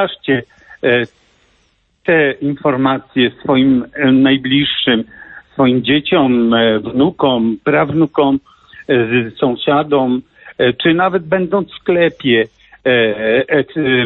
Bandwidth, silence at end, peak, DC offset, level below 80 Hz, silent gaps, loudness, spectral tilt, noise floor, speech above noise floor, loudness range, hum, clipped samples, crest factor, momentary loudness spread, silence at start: 4.2 kHz; 0 s; -2 dBFS; under 0.1%; -50 dBFS; none; -14 LUFS; -9 dB/octave; -58 dBFS; 45 dB; 2 LU; none; under 0.1%; 12 dB; 6 LU; 0 s